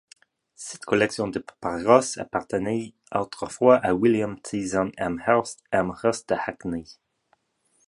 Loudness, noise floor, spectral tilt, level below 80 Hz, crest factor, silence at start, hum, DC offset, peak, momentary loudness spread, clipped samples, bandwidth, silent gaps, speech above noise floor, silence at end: -24 LUFS; -69 dBFS; -5 dB/octave; -56 dBFS; 22 dB; 0.6 s; none; under 0.1%; -2 dBFS; 13 LU; under 0.1%; 11.5 kHz; none; 45 dB; 0.95 s